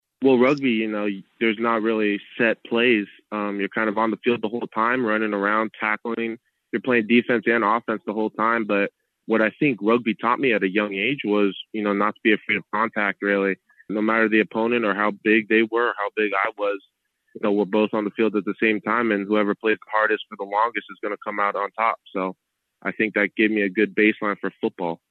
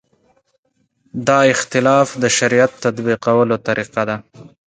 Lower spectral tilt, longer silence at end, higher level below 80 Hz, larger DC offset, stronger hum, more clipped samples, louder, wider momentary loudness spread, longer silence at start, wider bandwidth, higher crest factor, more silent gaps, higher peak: first, -7.5 dB/octave vs -4 dB/octave; about the same, 0.15 s vs 0.25 s; second, -74 dBFS vs -58 dBFS; neither; neither; neither; second, -22 LUFS vs -16 LUFS; about the same, 9 LU vs 9 LU; second, 0.2 s vs 1.15 s; second, 6 kHz vs 9.6 kHz; about the same, 16 dB vs 16 dB; neither; second, -6 dBFS vs 0 dBFS